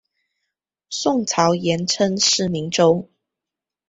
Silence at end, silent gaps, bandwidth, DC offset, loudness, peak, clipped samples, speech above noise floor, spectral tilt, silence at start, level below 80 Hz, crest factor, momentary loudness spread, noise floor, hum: 0.85 s; none; 8 kHz; under 0.1%; -19 LUFS; -2 dBFS; under 0.1%; 68 dB; -3.5 dB/octave; 0.9 s; -58 dBFS; 20 dB; 6 LU; -87 dBFS; none